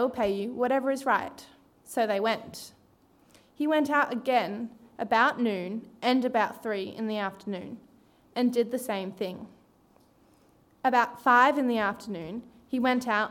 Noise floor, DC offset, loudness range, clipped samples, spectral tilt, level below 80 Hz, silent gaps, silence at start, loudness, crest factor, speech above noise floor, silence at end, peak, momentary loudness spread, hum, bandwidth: -62 dBFS; under 0.1%; 6 LU; under 0.1%; -4.5 dB/octave; -68 dBFS; none; 0 s; -28 LUFS; 20 dB; 35 dB; 0 s; -8 dBFS; 15 LU; none; 17 kHz